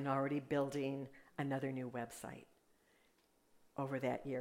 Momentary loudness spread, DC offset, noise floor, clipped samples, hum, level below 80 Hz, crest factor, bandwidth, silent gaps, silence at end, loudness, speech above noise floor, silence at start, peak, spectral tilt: 13 LU; under 0.1%; -75 dBFS; under 0.1%; none; -76 dBFS; 18 dB; 16 kHz; none; 0 s; -42 LUFS; 34 dB; 0 s; -24 dBFS; -6.5 dB/octave